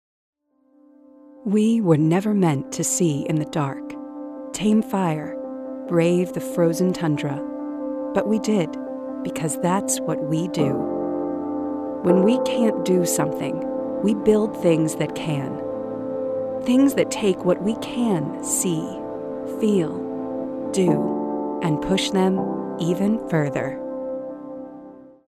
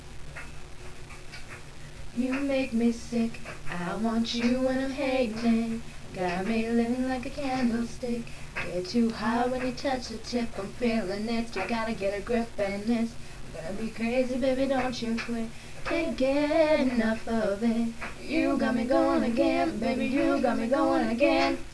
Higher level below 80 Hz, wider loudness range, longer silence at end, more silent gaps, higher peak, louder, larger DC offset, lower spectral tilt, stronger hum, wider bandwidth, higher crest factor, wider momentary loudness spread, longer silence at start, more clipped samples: second, -56 dBFS vs -46 dBFS; about the same, 3 LU vs 4 LU; first, 0.15 s vs 0 s; neither; first, -4 dBFS vs -12 dBFS; first, -22 LUFS vs -28 LUFS; neither; about the same, -5.5 dB/octave vs -5.5 dB/octave; neither; first, 15 kHz vs 11 kHz; about the same, 18 dB vs 16 dB; second, 11 LU vs 16 LU; first, 1.35 s vs 0 s; neither